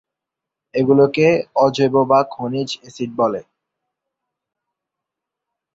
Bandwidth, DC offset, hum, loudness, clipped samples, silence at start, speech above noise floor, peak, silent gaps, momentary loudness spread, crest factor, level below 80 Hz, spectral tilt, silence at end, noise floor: 7.8 kHz; under 0.1%; none; -17 LUFS; under 0.1%; 0.75 s; 68 dB; -2 dBFS; none; 13 LU; 18 dB; -60 dBFS; -6.5 dB/octave; 2.35 s; -84 dBFS